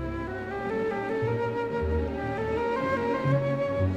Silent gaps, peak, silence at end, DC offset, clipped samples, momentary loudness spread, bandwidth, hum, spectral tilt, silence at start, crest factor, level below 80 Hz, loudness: none; -12 dBFS; 0 s; under 0.1%; under 0.1%; 6 LU; 8.8 kHz; none; -8.5 dB/octave; 0 s; 16 dB; -42 dBFS; -29 LUFS